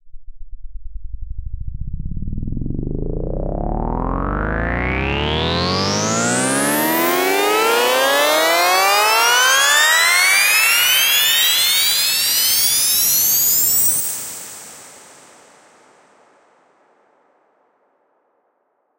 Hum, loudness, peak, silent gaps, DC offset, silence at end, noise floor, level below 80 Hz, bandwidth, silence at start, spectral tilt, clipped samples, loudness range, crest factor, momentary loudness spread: none; -14 LUFS; -2 dBFS; none; under 0.1%; 4 s; -66 dBFS; -32 dBFS; 16.5 kHz; 0.05 s; -1.5 dB/octave; under 0.1%; 14 LU; 16 dB; 18 LU